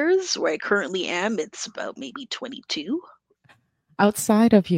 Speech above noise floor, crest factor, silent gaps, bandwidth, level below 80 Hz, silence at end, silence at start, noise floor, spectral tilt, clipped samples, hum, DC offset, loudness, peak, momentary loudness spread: 37 dB; 20 dB; none; 16 kHz; -66 dBFS; 0 s; 0 s; -60 dBFS; -4.5 dB/octave; under 0.1%; none; under 0.1%; -24 LUFS; -4 dBFS; 14 LU